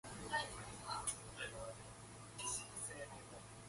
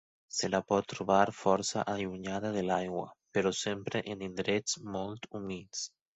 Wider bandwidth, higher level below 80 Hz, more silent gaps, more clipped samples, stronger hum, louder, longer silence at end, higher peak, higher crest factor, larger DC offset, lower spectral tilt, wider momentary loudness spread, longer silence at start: first, 12 kHz vs 8.4 kHz; about the same, -66 dBFS vs -64 dBFS; neither; neither; neither; second, -46 LUFS vs -33 LUFS; second, 0 s vs 0.3 s; second, -26 dBFS vs -10 dBFS; about the same, 22 dB vs 22 dB; neither; second, -2 dB/octave vs -4 dB/octave; about the same, 12 LU vs 11 LU; second, 0.05 s vs 0.3 s